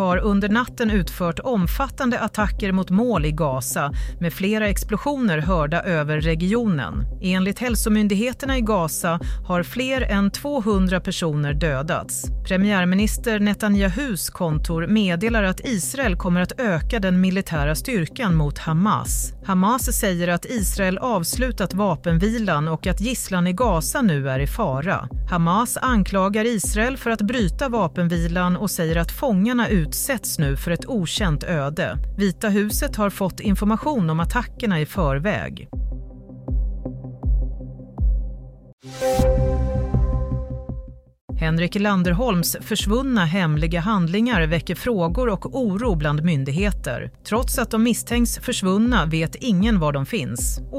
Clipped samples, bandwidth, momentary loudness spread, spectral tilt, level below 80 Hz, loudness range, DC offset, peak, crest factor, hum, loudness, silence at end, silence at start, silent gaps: under 0.1%; 16 kHz; 6 LU; -5.5 dB/octave; -30 dBFS; 3 LU; under 0.1%; -4 dBFS; 16 dB; none; -22 LUFS; 0 s; 0 s; 38.73-38.78 s, 41.21-41.28 s